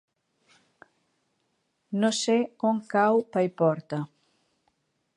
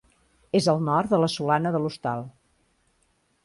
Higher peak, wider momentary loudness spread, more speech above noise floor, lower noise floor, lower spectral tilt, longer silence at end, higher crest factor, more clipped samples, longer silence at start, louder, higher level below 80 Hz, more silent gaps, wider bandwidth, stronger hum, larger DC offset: about the same, -10 dBFS vs -8 dBFS; first, 12 LU vs 9 LU; first, 50 dB vs 45 dB; first, -75 dBFS vs -68 dBFS; about the same, -5 dB/octave vs -6 dB/octave; about the same, 1.1 s vs 1.15 s; about the same, 18 dB vs 18 dB; neither; first, 1.9 s vs 0.55 s; about the same, -26 LUFS vs -24 LUFS; second, -80 dBFS vs -62 dBFS; neither; about the same, 11.5 kHz vs 11.5 kHz; neither; neither